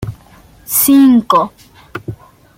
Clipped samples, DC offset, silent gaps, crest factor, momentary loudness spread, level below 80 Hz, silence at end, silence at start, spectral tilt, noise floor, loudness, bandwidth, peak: under 0.1%; under 0.1%; none; 14 dB; 22 LU; -44 dBFS; 0.45 s; 0 s; -4.5 dB/octave; -43 dBFS; -10 LUFS; 17 kHz; 0 dBFS